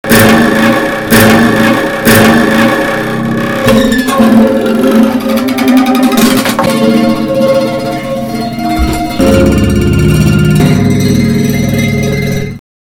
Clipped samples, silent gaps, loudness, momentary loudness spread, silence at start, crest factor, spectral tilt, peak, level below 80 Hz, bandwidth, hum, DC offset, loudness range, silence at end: 2%; none; -8 LUFS; 8 LU; 0.05 s; 8 dB; -5.5 dB/octave; 0 dBFS; -24 dBFS; 19 kHz; none; under 0.1%; 3 LU; 0.4 s